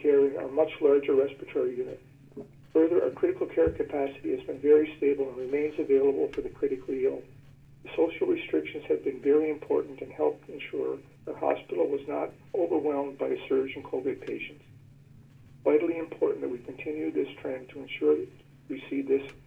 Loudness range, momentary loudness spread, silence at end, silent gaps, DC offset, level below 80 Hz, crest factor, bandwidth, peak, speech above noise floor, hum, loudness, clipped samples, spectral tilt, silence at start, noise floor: 5 LU; 14 LU; 0.1 s; none; under 0.1%; -60 dBFS; 18 dB; 3.8 kHz; -10 dBFS; 25 dB; none; -29 LUFS; under 0.1%; -8 dB/octave; 0 s; -53 dBFS